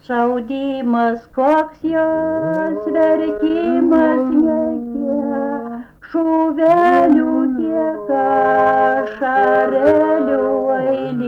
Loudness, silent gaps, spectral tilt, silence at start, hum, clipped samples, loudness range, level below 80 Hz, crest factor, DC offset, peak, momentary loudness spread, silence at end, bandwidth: -16 LUFS; none; -8 dB/octave; 0.1 s; none; under 0.1%; 3 LU; -52 dBFS; 12 dB; under 0.1%; -4 dBFS; 7 LU; 0 s; 5.8 kHz